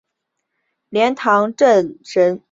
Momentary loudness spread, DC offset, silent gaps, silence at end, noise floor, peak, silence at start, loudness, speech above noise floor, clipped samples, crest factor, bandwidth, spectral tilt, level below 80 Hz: 6 LU; under 0.1%; none; 0.15 s; -76 dBFS; -2 dBFS; 0.9 s; -16 LUFS; 61 dB; under 0.1%; 16 dB; 7.8 kHz; -5 dB/octave; -66 dBFS